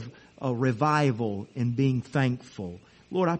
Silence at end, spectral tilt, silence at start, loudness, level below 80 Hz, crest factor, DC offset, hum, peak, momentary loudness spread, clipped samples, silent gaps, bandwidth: 0 s; -7.5 dB/octave; 0 s; -27 LUFS; -62 dBFS; 18 dB; under 0.1%; none; -10 dBFS; 15 LU; under 0.1%; none; 8.4 kHz